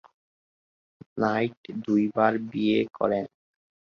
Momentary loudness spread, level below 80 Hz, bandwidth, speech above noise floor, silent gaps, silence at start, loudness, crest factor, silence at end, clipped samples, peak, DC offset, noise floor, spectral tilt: 10 LU; -66 dBFS; 6.8 kHz; over 65 dB; 1.57-1.64 s; 1.15 s; -26 LUFS; 20 dB; 0.6 s; under 0.1%; -8 dBFS; under 0.1%; under -90 dBFS; -7.5 dB/octave